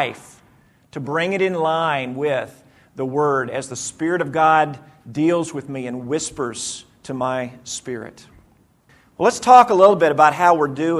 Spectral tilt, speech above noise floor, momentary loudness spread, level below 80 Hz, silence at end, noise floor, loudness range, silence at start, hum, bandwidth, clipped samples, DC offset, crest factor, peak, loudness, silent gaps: -4.5 dB/octave; 37 dB; 18 LU; -60 dBFS; 0 s; -55 dBFS; 11 LU; 0 s; none; 12.5 kHz; under 0.1%; under 0.1%; 20 dB; 0 dBFS; -18 LUFS; none